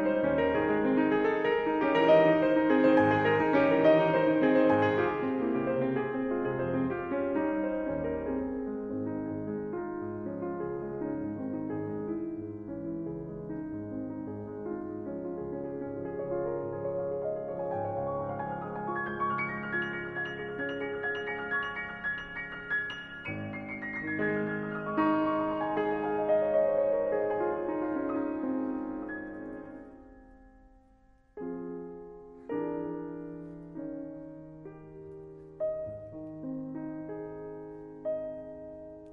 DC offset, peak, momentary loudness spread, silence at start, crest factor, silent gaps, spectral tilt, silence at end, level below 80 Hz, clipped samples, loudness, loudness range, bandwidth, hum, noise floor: under 0.1%; -10 dBFS; 17 LU; 0 s; 20 dB; none; -8.5 dB/octave; 0 s; -60 dBFS; under 0.1%; -31 LUFS; 15 LU; 6.2 kHz; none; -62 dBFS